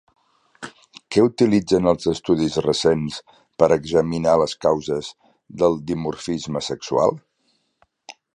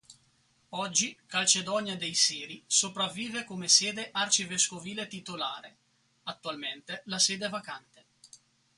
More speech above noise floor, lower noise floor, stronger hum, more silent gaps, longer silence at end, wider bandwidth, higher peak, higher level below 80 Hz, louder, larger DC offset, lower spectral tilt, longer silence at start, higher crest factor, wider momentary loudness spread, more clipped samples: first, 48 dB vs 37 dB; about the same, -67 dBFS vs -68 dBFS; neither; neither; second, 0.25 s vs 0.4 s; about the same, 11 kHz vs 11.5 kHz; first, -2 dBFS vs -8 dBFS; first, -50 dBFS vs -76 dBFS; first, -20 LUFS vs -28 LUFS; neither; first, -6 dB/octave vs -0.5 dB/octave; first, 0.6 s vs 0.1 s; second, 20 dB vs 26 dB; first, 19 LU vs 16 LU; neither